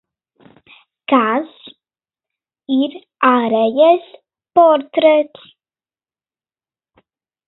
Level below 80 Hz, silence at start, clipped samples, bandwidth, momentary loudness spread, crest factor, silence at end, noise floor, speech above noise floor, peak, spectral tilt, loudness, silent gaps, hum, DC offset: -70 dBFS; 1.1 s; under 0.1%; 4.1 kHz; 11 LU; 18 dB; 2.2 s; under -90 dBFS; over 76 dB; 0 dBFS; -8.5 dB/octave; -15 LUFS; none; none; under 0.1%